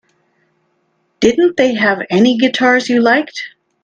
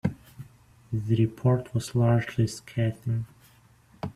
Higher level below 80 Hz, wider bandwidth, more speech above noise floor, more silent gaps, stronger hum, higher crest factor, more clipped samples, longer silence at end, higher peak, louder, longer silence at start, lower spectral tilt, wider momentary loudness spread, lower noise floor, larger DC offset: about the same, -54 dBFS vs -56 dBFS; second, 9 kHz vs 12.5 kHz; first, 50 dB vs 32 dB; neither; neither; about the same, 14 dB vs 16 dB; neither; first, 0.35 s vs 0.05 s; first, 0 dBFS vs -10 dBFS; first, -12 LUFS vs -27 LUFS; first, 1.2 s vs 0.05 s; second, -4.5 dB/octave vs -7.5 dB/octave; second, 9 LU vs 18 LU; first, -63 dBFS vs -58 dBFS; neither